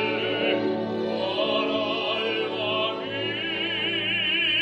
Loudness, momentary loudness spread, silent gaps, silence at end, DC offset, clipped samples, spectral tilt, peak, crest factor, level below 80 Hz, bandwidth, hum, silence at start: -25 LUFS; 5 LU; none; 0 s; under 0.1%; under 0.1%; -5.5 dB/octave; -12 dBFS; 14 dB; -68 dBFS; 8.4 kHz; none; 0 s